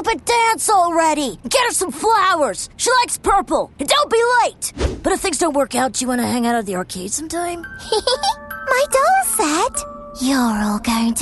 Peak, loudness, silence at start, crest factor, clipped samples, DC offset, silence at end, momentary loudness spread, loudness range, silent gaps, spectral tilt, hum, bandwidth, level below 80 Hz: -2 dBFS; -17 LUFS; 0 s; 16 dB; under 0.1%; under 0.1%; 0 s; 9 LU; 4 LU; none; -2.5 dB/octave; none; 12.5 kHz; -38 dBFS